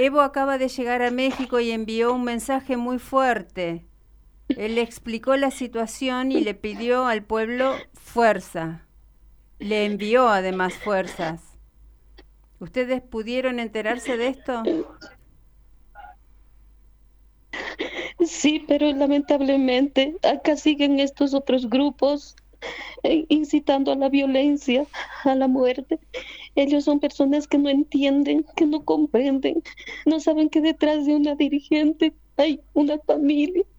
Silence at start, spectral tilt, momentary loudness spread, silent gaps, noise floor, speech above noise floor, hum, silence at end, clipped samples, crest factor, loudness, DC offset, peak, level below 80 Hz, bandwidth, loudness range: 0 s; -4.5 dB/octave; 10 LU; none; -54 dBFS; 32 dB; none; 0.15 s; under 0.1%; 18 dB; -22 LUFS; under 0.1%; -4 dBFS; -52 dBFS; 12.5 kHz; 7 LU